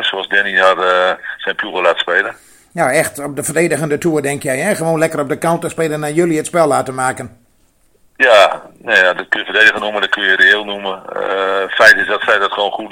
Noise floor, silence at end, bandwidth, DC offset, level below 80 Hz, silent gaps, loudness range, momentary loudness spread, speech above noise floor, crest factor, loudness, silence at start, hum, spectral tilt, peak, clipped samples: -54 dBFS; 0 s; over 20 kHz; under 0.1%; -56 dBFS; none; 5 LU; 11 LU; 40 dB; 14 dB; -13 LUFS; 0 s; none; -3.5 dB/octave; 0 dBFS; 0.3%